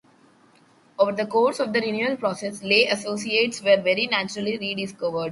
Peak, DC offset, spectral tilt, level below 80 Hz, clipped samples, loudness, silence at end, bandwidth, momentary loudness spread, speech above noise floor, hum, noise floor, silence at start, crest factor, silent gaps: -4 dBFS; under 0.1%; -3.5 dB/octave; -68 dBFS; under 0.1%; -23 LUFS; 0 s; 11.5 kHz; 8 LU; 34 dB; none; -57 dBFS; 1 s; 20 dB; none